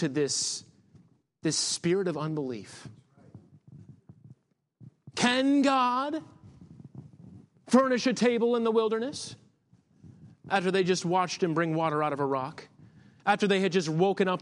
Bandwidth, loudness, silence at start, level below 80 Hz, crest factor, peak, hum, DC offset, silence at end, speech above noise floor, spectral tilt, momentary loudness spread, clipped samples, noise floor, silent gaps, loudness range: 11.5 kHz; -27 LUFS; 0 s; -74 dBFS; 20 dB; -8 dBFS; none; under 0.1%; 0 s; 37 dB; -4.5 dB/octave; 16 LU; under 0.1%; -64 dBFS; none; 5 LU